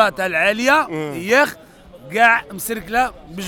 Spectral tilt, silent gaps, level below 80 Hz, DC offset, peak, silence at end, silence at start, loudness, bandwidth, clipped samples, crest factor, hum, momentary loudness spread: -3.5 dB/octave; none; -48 dBFS; under 0.1%; 0 dBFS; 0 s; 0 s; -17 LUFS; over 20 kHz; under 0.1%; 18 dB; none; 11 LU